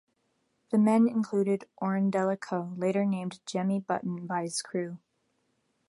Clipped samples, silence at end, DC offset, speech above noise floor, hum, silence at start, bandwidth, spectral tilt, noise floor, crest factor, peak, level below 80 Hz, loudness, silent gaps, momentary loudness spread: under 0.1%; 0.9 s; under 0.1%; 47 dB; none; 0.7 s; 11.5 kHz; -6.5 dB/octave; -75 dBFS; 16 dB; -14 dBFS; -78 dBFS; -29 LUFS; none; 10 LU